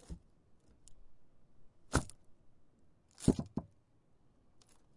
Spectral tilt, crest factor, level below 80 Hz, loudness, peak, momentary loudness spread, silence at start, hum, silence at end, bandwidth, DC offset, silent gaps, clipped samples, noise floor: -5.5 dB/octave; 30 dB; -52 dBFS; -37 LUFS; -12 dBFS; 20 LU; 0.1 s; none; 1.3 s; 11.5 kHz; under 0.1%; none; under 0.1%; -68 dBFS